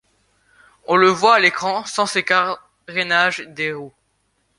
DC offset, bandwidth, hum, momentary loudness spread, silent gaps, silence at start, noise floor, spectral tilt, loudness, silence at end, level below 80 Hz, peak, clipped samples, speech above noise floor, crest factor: under 0.1%; 11.5 kHz; none; 13 LU; none; 0.9 s; -67 dBFS; -3 dB/octave; -17 LUFS; 0.7 s; -64 dBFS; -2 dBFS; under 0.1%; 49 dB; 18 dB